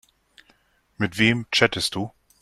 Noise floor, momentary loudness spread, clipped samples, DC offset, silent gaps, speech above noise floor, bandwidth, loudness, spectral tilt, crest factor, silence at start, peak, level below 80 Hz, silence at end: -62 dBFS; 12 LU; under 0.1%; under 0.1%; none; 40 dB; 13.5 kHz; -22 LUFS; -4 dB/octave; 24 dB; 1 s; -2 dBFS; -56 dBFS; 0.35 s